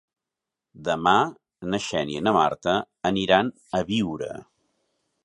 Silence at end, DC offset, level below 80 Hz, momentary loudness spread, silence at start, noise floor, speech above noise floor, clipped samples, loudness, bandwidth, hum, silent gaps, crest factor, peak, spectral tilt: 0.8 s; under 0.1%; -56 dBFS; 13 LU; 0.75 s; -87 dBFS; 63 dB; under 0.1%; -24 LUFS; 11 kHz; none; none; 22 dB; -2 dBFS; -5 dB/octave